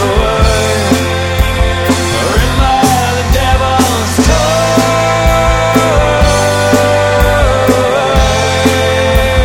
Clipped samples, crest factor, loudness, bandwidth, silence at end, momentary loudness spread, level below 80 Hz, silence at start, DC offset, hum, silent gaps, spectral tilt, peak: 0.2%; 10 dB; -10 LUFS; 18 kHz; 0 s; 2 LU; -16 dBFS; 0 s; under 0.1%; none; none; -4.5 dB/octave; 0 dBFS